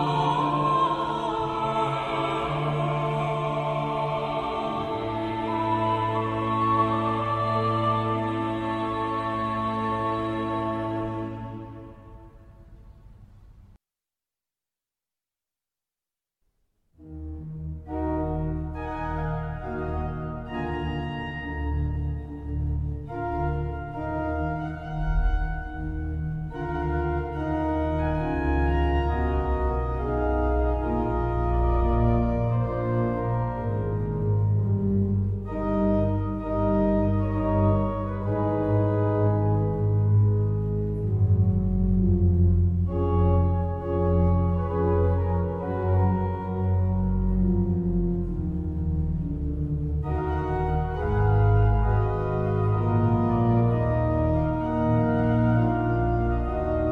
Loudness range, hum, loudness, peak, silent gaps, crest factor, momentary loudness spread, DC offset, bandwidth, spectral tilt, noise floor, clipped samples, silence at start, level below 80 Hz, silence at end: 8 LU; none; -26 LUFS; -10 dBFS; none; 16 dB; 9 LU; under 0.1%; 4.7 kHz; -9.5 dB/octave; under -90 dBFS; under 0.1%; 0 s; -32 dBFS; 0 s